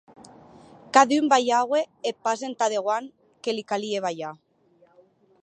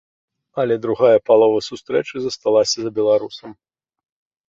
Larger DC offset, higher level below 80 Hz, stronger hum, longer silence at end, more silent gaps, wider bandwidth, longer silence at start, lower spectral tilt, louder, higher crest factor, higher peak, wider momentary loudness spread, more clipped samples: neither; second, -76 dBFS vs -62 dBFS; neither; first, 1.1 s vs 0.95 s; neither; first, 9.8 kHz vs 7.8 kHz; first, 0.95 s vs 0.55 s; about the same, -3 dB/octave vs -4 dB/octave; second, -24 LUFS vs -18 LUFS; first, 24 dB vs 16 dB; about the same, -2 dBFS vs -2 dBFS; about the same, 13 LU vs 11 LU; neither